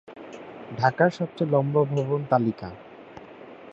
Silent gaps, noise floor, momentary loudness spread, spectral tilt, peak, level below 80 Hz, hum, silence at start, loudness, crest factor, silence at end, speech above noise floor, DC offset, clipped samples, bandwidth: none; -45 dBFS; 23 LU; -8 dB/octave; -4 dBFS; -62 dBFS; none; 0.1 s; -24 LUFS; 22 dB; 0 s; 21 dB; under 0.1%; under 0.1%; 7.8 kHz